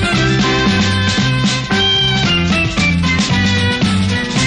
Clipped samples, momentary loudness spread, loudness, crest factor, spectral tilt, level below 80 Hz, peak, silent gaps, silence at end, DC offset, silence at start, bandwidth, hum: under 0.1%; 3 LU; -13 LUFS; 10 dB; -4.5 dB/octave; -30 dBFS; -4 dBFS; none; 0 s; under 0.1%; 0 s; 11 kHz; none